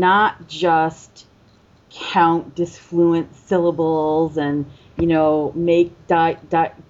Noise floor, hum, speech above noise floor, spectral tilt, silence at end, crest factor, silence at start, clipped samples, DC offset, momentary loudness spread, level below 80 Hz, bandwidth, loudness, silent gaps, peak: -52 dBFS; none; 34 dB; -6.5 dB/octave; 0.2 s; 14 dB; 0 s; under 0.1%; under 0.1%; 7 LU; -50 dBFS; 7.8 kHz; -19 LUFS; none; -4 dBFS